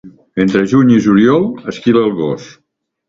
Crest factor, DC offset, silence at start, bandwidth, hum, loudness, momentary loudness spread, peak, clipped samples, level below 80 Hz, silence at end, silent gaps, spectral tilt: 12 dB; under 0.1%; 0.05 s; 7.6 kHz; none; -12 LUFS; 11 LU; 0 dBFS; under 0.1%; -48 dBFS; 0.6 s; none; -7.5 dB/octave